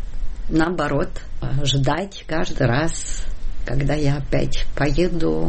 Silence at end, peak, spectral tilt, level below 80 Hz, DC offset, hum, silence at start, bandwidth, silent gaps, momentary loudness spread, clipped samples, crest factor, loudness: 0 s; -8 dBFS; -5.5 dB/octave; -26 dBFS; under 0.1%; none; 0 s; 8.8 kHz; none; 12 LU; under 0.1%; 12 dB; -23 LUFS